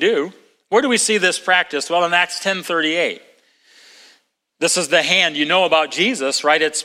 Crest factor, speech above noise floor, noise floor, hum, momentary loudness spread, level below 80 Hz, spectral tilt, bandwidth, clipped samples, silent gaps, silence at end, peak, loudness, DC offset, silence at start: 18 dB; 41 dB; -58 dBFS; none; 7 LU; -70 dBFS; -1.5 dB/octave; 16.5 kHz; under 0.1%; none; 0 s; 0 dBFS; -16 LUFS; under 0.1%; 0 s